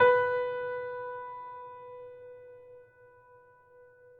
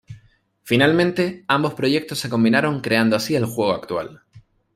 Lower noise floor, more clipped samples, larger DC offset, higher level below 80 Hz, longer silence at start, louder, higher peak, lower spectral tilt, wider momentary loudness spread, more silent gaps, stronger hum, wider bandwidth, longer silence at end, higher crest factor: about the same, -58 dBFS vs -55 dBFS; neither; neither; second, -74 dBFS vs -58 dBFS; about the same, 0 s vs 0.1 s; second, -32 LUFS vs -20 LUFS; second, -10 dBFS vs -2 dBFS; about the same, -6 dB/octave vs -5.5 dB/octave; first, 24 LU vs 8 LU; neither; neither; second, 4.4 kHz vs 16 kHz; first, 1.4 s vs 0.35 s; about the same, 22 dB vs 18 dB